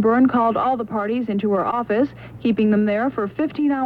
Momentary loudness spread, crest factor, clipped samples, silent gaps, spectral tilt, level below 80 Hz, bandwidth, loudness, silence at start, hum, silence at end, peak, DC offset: 7 LU; 12 dB; under 0.1%; none; -9 dB/octave; -54 dBFS; 4.9 kHz; -20 LUFS; 0 s; none; 0 s; -8 dBFS; under 0.1%